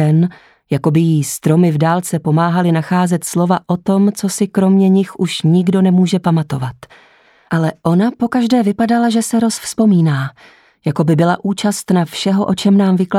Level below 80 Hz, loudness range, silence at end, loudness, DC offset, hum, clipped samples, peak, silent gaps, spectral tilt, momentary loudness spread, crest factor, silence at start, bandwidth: -56 dBFS; 2 LU; 0 s; -14 LUFS; under 0.1%; none; under 0.1%; 0 dBFS; none; -6.5 dB/octave; 6 LU; 12 dB; 0 s; 14.5 kHz